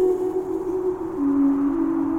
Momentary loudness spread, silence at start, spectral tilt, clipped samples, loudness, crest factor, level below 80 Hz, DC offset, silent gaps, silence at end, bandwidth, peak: 6 LU; 0 s; -8.5 dB/octave; under 0.1%; -23 LUFS; 10 dB; -50 dBFS; under 0.1%; none; 0 s; 7.8 kHz; -12 dBFS